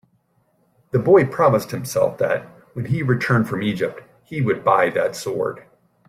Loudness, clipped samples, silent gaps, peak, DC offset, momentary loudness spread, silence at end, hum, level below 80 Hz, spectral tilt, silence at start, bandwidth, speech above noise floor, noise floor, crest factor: -20 LUFS; under 0.1%; none; -2 dBFS; under 0.1%; 12 LU; 0.5 s; none; -58 dBFS; -6.5 dB/octave; 0.95 s; 15.5 kHz; 45 dB; -64 dBFS; 18 dB